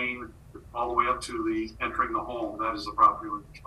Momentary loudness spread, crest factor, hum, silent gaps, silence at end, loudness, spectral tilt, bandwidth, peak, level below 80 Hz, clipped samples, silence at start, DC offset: 14 LU; 20 dB; none; none; 0 s; -28 LUFS; -4.5 dB/octave; 12.5 kHz; -8 dBFS; -50 dBFS; under 0.1%; 0 s; under 0.1%